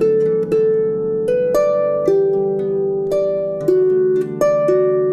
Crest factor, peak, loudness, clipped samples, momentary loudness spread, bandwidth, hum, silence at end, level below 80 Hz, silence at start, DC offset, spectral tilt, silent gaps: 12 dB; -4 dBFS; -17 LUFS; under 0.1%; 4 LU; 13.5 kHz; none; 0 s; -52 dBFS; 0 s; under 0.1%; -8 dB/octave; none